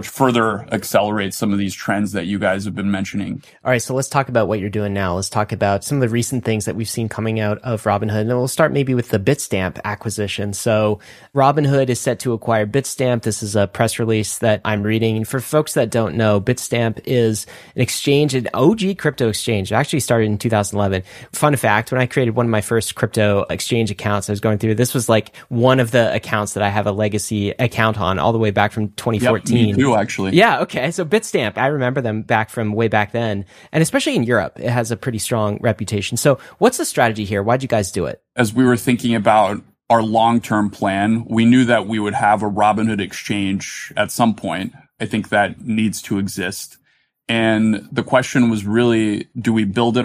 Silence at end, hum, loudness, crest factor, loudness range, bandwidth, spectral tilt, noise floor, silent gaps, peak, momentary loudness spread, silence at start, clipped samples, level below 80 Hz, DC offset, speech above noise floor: 0 s; none; -18 LUFS; 16 dB; 4 LU; 15.5 kHz; -5.5 dB/octave; -56 dBFS; none; -2 dBFS; 7 LU; 0 s; under 0.1%; -52 dBFS; under 0.1%; 39 dB